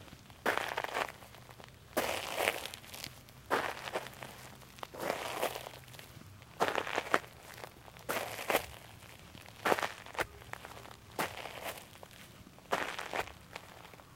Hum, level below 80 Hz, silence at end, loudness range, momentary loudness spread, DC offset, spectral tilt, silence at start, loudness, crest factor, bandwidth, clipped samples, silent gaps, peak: none; -64 dBFS; 0 s; 4 LU; 19 LU; under 0.1%; -2.5 dB/octave; 0 s; -37 LUFS; 32 dB; 16 kHz; under 0.1%; none; -8 dBFS